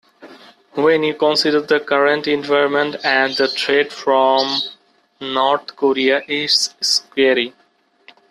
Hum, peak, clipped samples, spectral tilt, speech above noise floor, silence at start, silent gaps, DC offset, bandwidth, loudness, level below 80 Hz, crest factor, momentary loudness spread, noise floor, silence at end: none; -2 dBFS; under 0.1%; -2.5 dB/octave; 35 dB; 0.2 s; none; under 0.1%; 13 kHz; -16 LUFS; -66 dBFS; 16 dB; 5 LU; -52 dBFS; 0.8 s